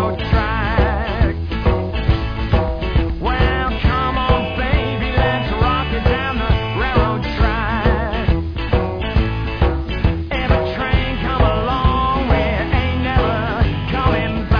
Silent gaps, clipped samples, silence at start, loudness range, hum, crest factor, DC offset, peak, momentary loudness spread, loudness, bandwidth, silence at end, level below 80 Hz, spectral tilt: none; under 0.1%; 0 s; 1 LU; none; 14 dB; 0.5%; -2 dBFS; 3 LU; -18 LUFS; 5.4 kHz; 0 s; -22 dBFS; -8.5 dB/octave